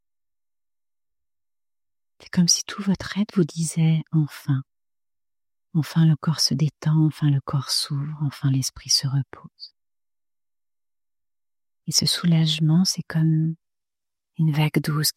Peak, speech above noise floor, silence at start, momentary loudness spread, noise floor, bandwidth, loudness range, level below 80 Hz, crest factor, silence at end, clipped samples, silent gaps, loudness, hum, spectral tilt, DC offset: -4 dBFS; over 68 dB; 2.35 s; 8 LU; under -90 dBFS; 15.5 kHz; 5 LU; -60 dBFS; 20 dB; 0.05 s; under 0.1%; none; -22 LUFS; none; -4.5 dB/octave; under 0.1%